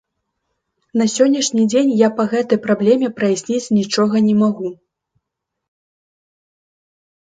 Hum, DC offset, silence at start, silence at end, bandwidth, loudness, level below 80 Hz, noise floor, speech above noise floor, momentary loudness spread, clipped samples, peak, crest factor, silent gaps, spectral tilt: none; under 0.1%; 0.95 s; 2.5 s; 9.4 kHz; -16 LUFS; -64 dBFS; -78 dBFS; 63 dB; 5 LU; under 0.1%; 0 dBFS; 18 dB; none; -5 dB/octave